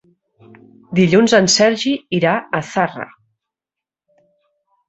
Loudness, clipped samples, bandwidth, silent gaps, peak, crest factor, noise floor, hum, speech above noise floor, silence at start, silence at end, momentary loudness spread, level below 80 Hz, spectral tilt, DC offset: -15 LUFS; under 0.1%; 8.2 kHz; none; 0 dBFS; 18 dB; -87 dBFS; none; 72 dB; 0.9 s; 1.85 s; 10 LU; -56 dBFS; -4 dB/octave; under 0.1%